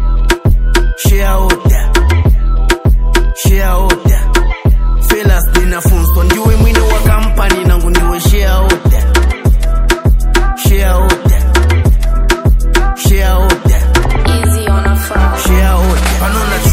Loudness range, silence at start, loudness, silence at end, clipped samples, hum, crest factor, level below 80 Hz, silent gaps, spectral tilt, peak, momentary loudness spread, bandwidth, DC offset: 1 LU; 0 s; -11 LUFS; 0 s; 0.4%; none; 8 dB; -10 dBFS; none; -5 dB/octave; 0 dBFS; 3 LU; 16.5 kHz; under 0.1%